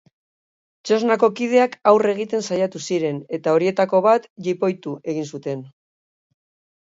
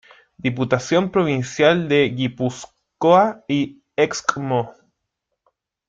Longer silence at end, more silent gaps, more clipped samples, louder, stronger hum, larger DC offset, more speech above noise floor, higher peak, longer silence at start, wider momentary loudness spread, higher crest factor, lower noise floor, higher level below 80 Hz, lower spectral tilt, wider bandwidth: about the same, 1.15 s vs 1.15 s; first, 4.30-4.36 s vs none; neither; about the same, -20 LUFS vs -20 LUFS; neither; neither; first, over 71 dB vs 59 dB; about the same, 0 dBFS vs -2 dBFS; first, 0.85 s vs 0.45 s; about the same, 12 LU vs 10 LU; about the same, 20 dB vs 20 dB; first, under -90 dBFS vs -78 dBFS; second, -72 dBFS vs -58 dBFS; about the same, -5.5 dB/octave vs -5.5 dB/octave; second, 7.8 kHz vs 9 kHz